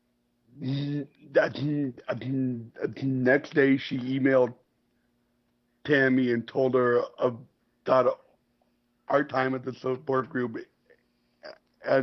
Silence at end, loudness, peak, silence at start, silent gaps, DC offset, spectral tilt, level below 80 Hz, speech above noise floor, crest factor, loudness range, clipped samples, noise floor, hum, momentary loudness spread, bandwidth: 0 s; -27 LUFS; -8 dBFS; 0.55 s; none; under 0.1%; -8 dB/octave; -70 dBFS; 46 dB; 20 dB; 5 LU; under 0.1%; -72 dBFS; none; 12 LU; 6.2 kHz